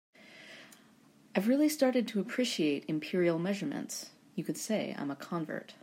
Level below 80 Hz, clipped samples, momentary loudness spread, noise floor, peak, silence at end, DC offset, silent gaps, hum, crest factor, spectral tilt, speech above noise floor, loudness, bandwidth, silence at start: -84 dBFS; under 0.1%; 16 LU; -62 dBFS; -14 dBFS; 0.1 s; under 0.1%; none; none; 20 dB; -5 dB/octave; 30 dB; -33 LUFS; 16 kHz; 0.25 s